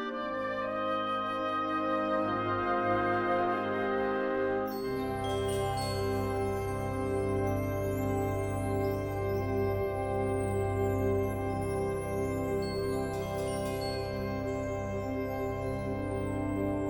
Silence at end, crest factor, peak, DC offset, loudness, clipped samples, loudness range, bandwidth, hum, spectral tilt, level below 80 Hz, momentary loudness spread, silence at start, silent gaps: 0 s; 14 dB; -18 dBFS; under 0.1%; -32 LUFS; under 0.1%; 4 LU; 17 kHz; none; -6.5 dB/octave; -48 dBFS; 5 LU; 0 s; none